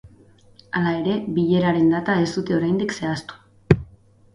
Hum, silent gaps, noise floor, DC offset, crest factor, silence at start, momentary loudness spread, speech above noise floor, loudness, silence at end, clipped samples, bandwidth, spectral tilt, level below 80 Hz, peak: none; none; -51 dBFS; under 0.1%; 22 dB; 0.05 s; 9 LU; 31 dB; -21 LUFS; 0.5 s; under 0.1%; 11 kHz; -7 dB/octave; -46 dBFS; 0 dBFS